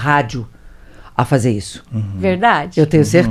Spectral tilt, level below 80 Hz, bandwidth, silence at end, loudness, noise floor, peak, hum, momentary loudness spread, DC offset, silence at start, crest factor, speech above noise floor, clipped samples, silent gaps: -6.5 dB/octave; -40 dBFS; 14.5 kHz; 0 s; -16 LUFS; -38 dBFS; 0 dBFS; none; 12 LU; under 0.1%; 0 s; 16 dB; 24 dB; under 0.1%; none